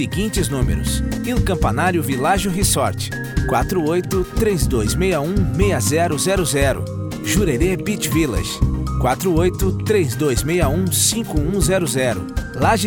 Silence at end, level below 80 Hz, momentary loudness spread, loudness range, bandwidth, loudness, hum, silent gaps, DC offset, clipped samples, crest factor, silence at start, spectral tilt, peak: 0 s; -26 dBFS; 4 LU; 1 LU; over 20 kHz; -19 LUFS; none; none; 0.1%; under 0.1%; 16 dB; 0 s; -5 dB/octave; -2 dBFS